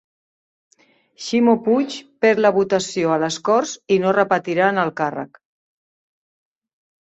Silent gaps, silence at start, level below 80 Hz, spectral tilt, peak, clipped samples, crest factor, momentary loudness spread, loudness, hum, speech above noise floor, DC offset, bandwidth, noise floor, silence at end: none; 1.2 s; -64 dBFS; -5 dB/octave; -2 dBFS; under 0.1%; 18 dB; 9 LU; -19 LUFS; none; over 72 dB; under 0.1%; 8.2 kHz; under -90 dBFS; 1.75 s